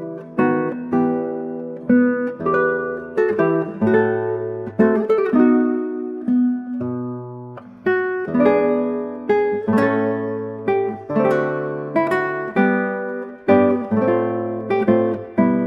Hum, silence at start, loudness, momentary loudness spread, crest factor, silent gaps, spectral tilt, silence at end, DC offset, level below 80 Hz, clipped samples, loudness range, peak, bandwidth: none; 0 s; -19 LUFS; 10 LU; 16 dB; none; -9 dB/octave; 0 s; under 0.1%; -60 dBFS; under 0.1%; 2 LU; -4 dBFS; 5.6 kHz